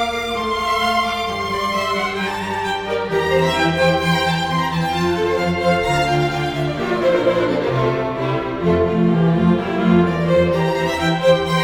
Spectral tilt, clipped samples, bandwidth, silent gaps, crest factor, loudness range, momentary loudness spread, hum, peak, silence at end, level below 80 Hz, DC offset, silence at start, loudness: -6 dB/octave; under 0.1%; 17 kHz; none; 16 dB; 2 LU; 6 LU; none; -2 dBFS; 0 s; -40 dBFS; under 0.1%; 0 s; -18 LUFS